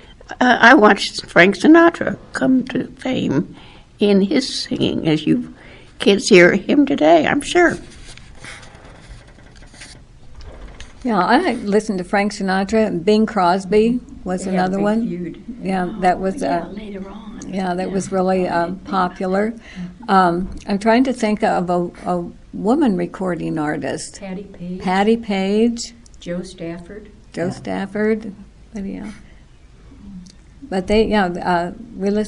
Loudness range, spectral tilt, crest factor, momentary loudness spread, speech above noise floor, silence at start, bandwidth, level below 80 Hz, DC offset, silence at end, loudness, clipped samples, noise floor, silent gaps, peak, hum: 9 LU; -5.5 dB/octave; 18 dB; 19 LU; 27 dB; 0.1 s; 11.5 kHz; -44 dBFS; under 0.1%; 0 s; -17 LUFS; under 0.1%; -44 dBFS; none; 0 dBFS; none